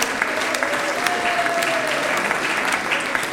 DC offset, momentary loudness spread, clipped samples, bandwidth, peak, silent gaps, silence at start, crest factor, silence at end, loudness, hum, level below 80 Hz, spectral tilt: under 0.1%; 1 LU; under 0.1%; 16.5 kHz; 0 dBFS; none; 0 s; 22 dB; 0 s; -20 LUFS; none; -56 dBFS; -1.5 dB/octave